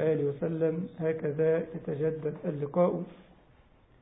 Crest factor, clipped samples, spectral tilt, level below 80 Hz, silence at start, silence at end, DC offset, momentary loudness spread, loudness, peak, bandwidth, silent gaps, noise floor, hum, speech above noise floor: 18 dB; under 0.1%; -12 dB/octave; -64 dBFS; 0 s; 0.8 s; under 0.1%; 7 LU; -31 LUFS; -14 dBFS; 3.9 kHz; none; -60 dBFS; none; 30 dB